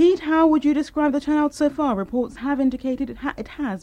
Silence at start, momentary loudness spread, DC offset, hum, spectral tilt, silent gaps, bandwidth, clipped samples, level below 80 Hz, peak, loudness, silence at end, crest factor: 0 s; 11 LU; under 0.1%; none; -6 dB/octave; none; 10.5 kHz; under 0.1%; -48 dBFS; -8 dBFS; -22 LUFS; 0.05 s; 14 dB